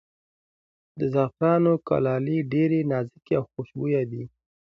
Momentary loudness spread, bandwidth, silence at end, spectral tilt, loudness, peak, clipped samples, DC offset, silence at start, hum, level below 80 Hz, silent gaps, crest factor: 10 LU; 5.8 kHz; 0.4 s; -10.5 dB/octave; -25 LUFS; -8 dBFS; under 0.1%; under 0.1%; 0.95 s; none; -62 dBFS; none; 18 dB